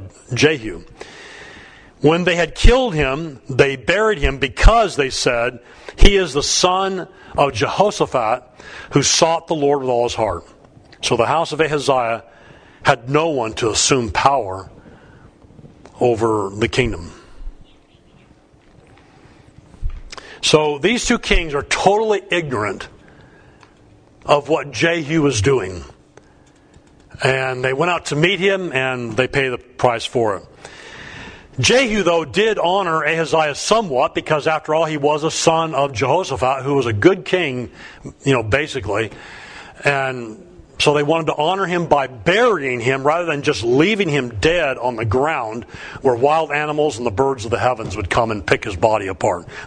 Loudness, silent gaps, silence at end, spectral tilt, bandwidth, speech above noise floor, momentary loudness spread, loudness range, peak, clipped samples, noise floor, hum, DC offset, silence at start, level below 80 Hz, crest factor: -17 LUFS; none; 0 s; -4 dB/octave; 10.5 kHz; 33 dB; 17 LU; 4 LU; 0 dBFS; under 0.1%; -50 dBFS; none; under 0.1%; 0 s; -28 dBFS; 18 dB